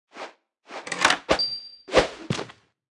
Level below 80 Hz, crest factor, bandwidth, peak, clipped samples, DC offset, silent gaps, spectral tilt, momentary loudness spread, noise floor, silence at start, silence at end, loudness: -48 dBFS; 24 dB; 12 kHz; -2 dBFS; under 0.1%; under 0.1%; none; -3 dB/octave; 20 LU; -47 dBFS; 0.15 s; 0.4 s; -24 LUFS